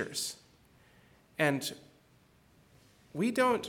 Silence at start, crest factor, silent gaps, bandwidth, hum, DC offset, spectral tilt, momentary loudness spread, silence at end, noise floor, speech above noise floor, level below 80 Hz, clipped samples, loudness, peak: 0 s; 22 dB; none; 19 kHz; none; under 0.1%; -4 dB/octave; 19 LU; 0 s; -64 dBFS; 33 dB; -72 dBFS; under 0.1%; -33 LUFS; -14 dBFS